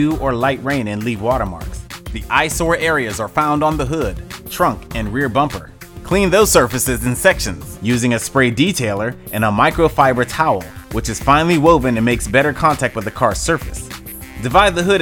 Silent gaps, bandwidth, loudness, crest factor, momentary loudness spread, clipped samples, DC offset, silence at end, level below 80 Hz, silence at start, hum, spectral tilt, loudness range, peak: none; over 20 kHz; -16 LUFS; 16 dB; 14 LU; under 0.1%; under 0.1%; 0 s; -32 dBFS; 0 s; none; -4.5 dB/octave; 4 LU; 0 dBFS